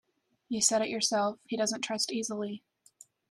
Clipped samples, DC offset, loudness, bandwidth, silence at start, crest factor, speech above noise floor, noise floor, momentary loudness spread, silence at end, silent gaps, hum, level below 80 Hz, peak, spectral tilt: under 0.1%; under 0.1%; -30 LUFS; 13.5 kHz; 0.5 s; 20 dB; 29 dB; -60 dBFS; 11 LU; 0.75 s; none; none; -76 dBFS; -12 dBFS; -2 dB/octave